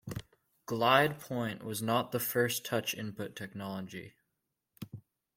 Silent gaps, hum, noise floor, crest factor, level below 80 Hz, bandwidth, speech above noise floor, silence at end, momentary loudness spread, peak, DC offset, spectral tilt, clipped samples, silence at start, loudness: none; none; -85 dBFS; 26 dB; -68 dBFS; 16.5 kHz; 52 dB; 0.35 s; 21 LU; -10 dBFS; under 0.1%; -4 dB/octave; under 0.1%; 0.05 s; -32 LUFS